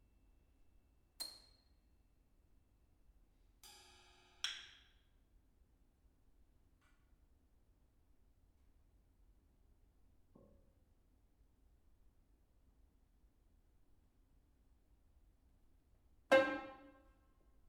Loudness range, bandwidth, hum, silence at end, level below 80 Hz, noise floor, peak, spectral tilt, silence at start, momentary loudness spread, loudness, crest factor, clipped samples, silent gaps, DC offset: 16 LU; 12.5 kHz; none; 0.9 s; -72 dBFS; -73 dBFS; -18 dBFS; -2.5 dB/octave; 1.2 s; 28 LU; -38 LUFS; 32 dB; under 0.1%; none; under 0.1%